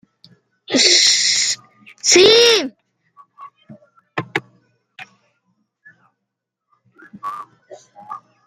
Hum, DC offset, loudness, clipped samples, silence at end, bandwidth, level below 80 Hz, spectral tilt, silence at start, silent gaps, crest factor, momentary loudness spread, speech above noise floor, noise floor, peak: none; under 0.1%; -13 LUFS; under 0.1%; 0.3 s; 16 kHz; -64 dBFS; -0.5 dB/octave; 0.7 s; none; 20 dB; 24 LU; 68 dB; -79 dBFS; 0 dBFS